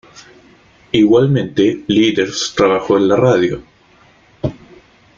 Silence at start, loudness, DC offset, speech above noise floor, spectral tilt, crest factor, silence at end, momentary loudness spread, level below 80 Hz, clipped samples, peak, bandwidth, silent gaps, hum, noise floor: 0.95 s; -14 LUFS; under 0.1%; 36 dB; -5.5 dB/octave; 14 dB; 0.65 s; 13 LU; -46 dBFS; under 0.1%; -2 dBFS; 7.4 kHz; none; none; -49 dBFS